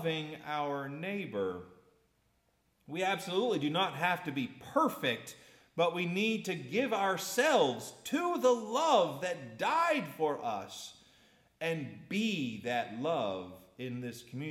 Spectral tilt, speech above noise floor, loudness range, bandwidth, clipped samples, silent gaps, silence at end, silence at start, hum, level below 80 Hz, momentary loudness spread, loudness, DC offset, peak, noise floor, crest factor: -4.5 dB/octave; 41 dB; 6 LU; 17 kHz; under 0.1%; none; 0 s; 0 s; none; -78 dBFS; 13 LU; -33 LUFS; under 0.1%; -14 dBFS; -74 dBFS; 20 dB